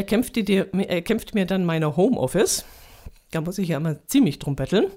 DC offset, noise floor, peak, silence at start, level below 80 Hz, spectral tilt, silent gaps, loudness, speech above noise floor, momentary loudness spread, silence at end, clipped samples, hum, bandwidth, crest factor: under 0.1%; -44 dBFS; -8 dBFS; 0 s; -46 dBFS; -5.5 dB/octave; none; -23 LUFS; 22 dB; 6 LU; 0 s; under 0.1%; none; 16 kHz; 16 dB